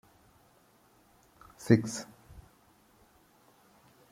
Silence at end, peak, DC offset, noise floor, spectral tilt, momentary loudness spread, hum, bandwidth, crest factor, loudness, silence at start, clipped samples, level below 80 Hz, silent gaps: 1.7 s; -8 dBFS; under 0.1%; -64 dBFS; -6.5 dB/octave; 29 LU; none; 16 kHz; 28 dB; -29 LUFS; 1.6 s; under 0.1%; -64 dBFS; none